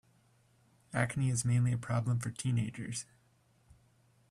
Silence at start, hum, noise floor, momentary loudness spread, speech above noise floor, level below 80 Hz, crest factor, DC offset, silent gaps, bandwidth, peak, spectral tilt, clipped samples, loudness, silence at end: 0.9 s; none; -69 dBFS; 10 LU; 37 dB; -64 dBFS; 20 dB; under 0.1%; none; 12.5 kHz; -16 dBFS; -5.5 dB/octave; under 0.1%; -34 LUFS; 1.25 s